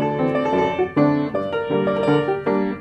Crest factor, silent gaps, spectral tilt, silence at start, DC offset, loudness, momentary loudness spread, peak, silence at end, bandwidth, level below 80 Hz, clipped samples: 14 dB; none; -8 dB/octave; 0 s; under 0.1%; -20 LUFS; 4 LU; -6 dBFS; 0 s; 8.2 kHz; -56 dBFS; under 0.1%